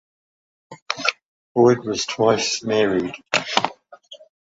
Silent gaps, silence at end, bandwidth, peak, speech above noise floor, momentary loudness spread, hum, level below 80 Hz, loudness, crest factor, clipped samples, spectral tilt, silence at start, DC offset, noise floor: 0.82-0.86 s, 1.25-1.55 s; 0.35 s; 8 kHz; -2 dBFS; 26 dB; 8 LU; none; -60 dBFS; -20 LUFS; 20 dB; under 0.1%; -3.5 dB/octave; 0.7 s; under 0.1%; -45 dBFS